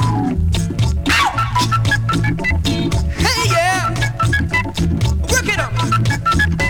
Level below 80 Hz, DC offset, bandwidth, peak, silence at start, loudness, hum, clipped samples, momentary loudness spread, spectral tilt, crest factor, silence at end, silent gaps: -24 dBFS; under 0.1%; 18.5 kHz; -2 dBFS; 0 s; -16 LUFS; none; under 0.1%; 4 LU; -4.5 dB/octave; 14 dB; 0 s; none